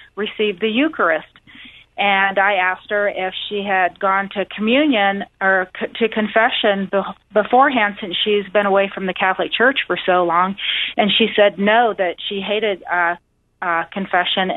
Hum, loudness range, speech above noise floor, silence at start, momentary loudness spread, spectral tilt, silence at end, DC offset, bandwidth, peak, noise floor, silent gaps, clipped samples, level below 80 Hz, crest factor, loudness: none; 2 LU; 25 dB; 0.15 s; 7 LU; -7.5 dB/octave; 0 s; under 0.1%; 4.1 kHz; -2 dBFS; -42 dBFS; none; under 0.1%; -58 dBFS; 16 dB; -17 LUFS